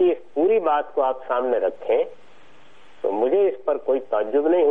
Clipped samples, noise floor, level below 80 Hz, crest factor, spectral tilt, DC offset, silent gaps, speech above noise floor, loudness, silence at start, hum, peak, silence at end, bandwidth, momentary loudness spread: under 0.1%; -53 dBFS; -72 dBFS; 12 dB; -7 dB/octave; 0.9%; none; 32 dB; -22 LUFS; 0 s; none; -10 dBFS; 0 s; 3.8 kHz; 5 LU